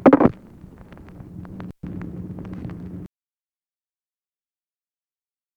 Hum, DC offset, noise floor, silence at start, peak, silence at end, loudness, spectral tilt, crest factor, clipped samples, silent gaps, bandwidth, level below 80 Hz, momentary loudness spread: none; under 0.1%; under -90 dBFS; 0 s; -2 dBFS; 2.5 s; -24 LUFS; -10 dB/octave; 24 dB; under 0.1%; none; 4.8 kHz; -50 dBFS; 25 LU